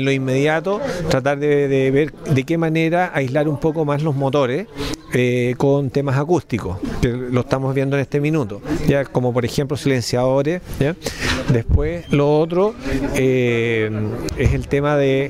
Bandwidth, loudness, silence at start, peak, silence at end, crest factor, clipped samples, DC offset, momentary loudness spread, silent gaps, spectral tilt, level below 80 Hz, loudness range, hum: 15.5 kHz; -19 LUFS; 0 s; -4 dBFS; 0 s; 14 dB; under 0.1%; 0.2%; 6 LU; none; -6.5 dB/octave; -34 dBFS; 2 LU; none